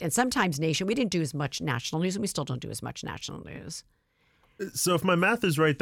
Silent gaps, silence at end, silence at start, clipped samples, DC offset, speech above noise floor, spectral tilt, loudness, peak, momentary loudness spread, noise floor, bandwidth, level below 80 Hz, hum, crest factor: none; 0.05 s; 0 s; under 0.1%; under 0.1%; 39 dB; -4.5 dB/octave; -28 LUFS; -8 dBFS; 15 LU; -67 dBFS; 17.5 kHz; -60 dBFS; none; 20 dB